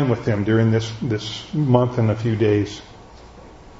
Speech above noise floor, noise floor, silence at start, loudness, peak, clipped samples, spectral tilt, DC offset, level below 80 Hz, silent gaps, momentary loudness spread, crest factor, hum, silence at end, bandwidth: 23 dB; -42 dBFS; 0 s; -20 LUFS; -2 dBFS; under 0.1%; -7.5 dB/octave; under 0.1%; -48 dBFS; none; 8 LU; 18 dB; none; 0 s; 7.8 kHz